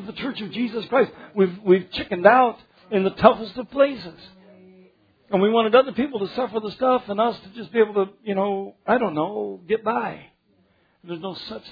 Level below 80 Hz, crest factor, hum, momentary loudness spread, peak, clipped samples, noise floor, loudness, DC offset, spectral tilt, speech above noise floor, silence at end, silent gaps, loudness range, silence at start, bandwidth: -58 dBFS; 22 dB; none; 15 LU; 0 dBFS; under 0.1%; -63 dBFS; -22 LUFS; under 0.1%; -8.5 dB/octave; 41 dB; 0 s; none; 5 LU; 0 s; 5 kHz